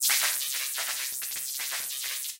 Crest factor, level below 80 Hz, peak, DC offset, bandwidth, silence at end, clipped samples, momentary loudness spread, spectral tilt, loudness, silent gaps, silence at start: 18 dB; -78 dBFS; -12 dBFS; under 0.1%; 17 kHz; 0 s; under 0.1%; 7 LU; 4.5 dB/octave; -28 LUFS; none; 0 s